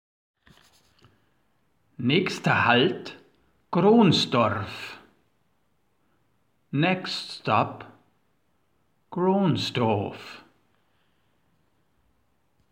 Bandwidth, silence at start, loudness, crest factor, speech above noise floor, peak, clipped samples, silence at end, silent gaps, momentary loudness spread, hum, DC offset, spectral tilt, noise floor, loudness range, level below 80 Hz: 14.5 kHz; 2 s; -23 LUFS; 22 dB; 49 dB; -4 dBFS; under 0.1%; 2.3 s; none; 18 LU; none; under 0.1%; -6 dB/octave; -72 dBFS; 7 LU; -68 dBFS